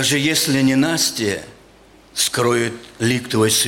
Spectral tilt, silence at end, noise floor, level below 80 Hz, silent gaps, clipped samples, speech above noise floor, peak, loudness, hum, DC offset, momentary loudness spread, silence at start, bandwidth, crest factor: -3 dB/octave; 0 s; -48 dBFS; -54 dBFS; none; under 0.1%; 30 dB; -4 dBFS; -18 LUFS; none; under 0.1%; 8 LU; 0 s; 17 kHz; 14 dB